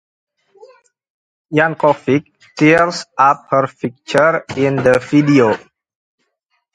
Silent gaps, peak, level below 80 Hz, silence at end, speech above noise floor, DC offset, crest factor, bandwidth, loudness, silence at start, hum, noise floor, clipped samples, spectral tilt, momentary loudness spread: none; 0 dBFS; -54 dBFS; 1.15 s; 55 dB; under 0.1%; 16 dB; 11 kHz; -14 LUFS; 1.5 s; none; -69 dBFS; under 0.1%; -6.5 dB/octave; 8 LU